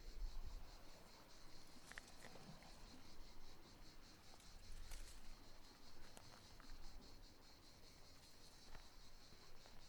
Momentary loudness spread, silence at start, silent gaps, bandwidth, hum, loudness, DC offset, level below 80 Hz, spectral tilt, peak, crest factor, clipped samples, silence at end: 6 LU; 0 s; none; 19.5 kHz; none; -63 LUFS; under 0.1%; -58 dBFS; -3 dB/octave; -34 dBFS; 22 dB; under 0.1%; 0 s